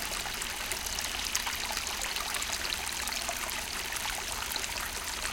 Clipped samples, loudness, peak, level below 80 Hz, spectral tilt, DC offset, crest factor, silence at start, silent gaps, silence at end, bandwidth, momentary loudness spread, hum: under 0.1%; -32 LUFS; -10 dBFS; -48 dBFS; 0 dB/octave; under 0.1%; 26 dB; 0 s; none; 0 s; 17 kHz; 3 LU; none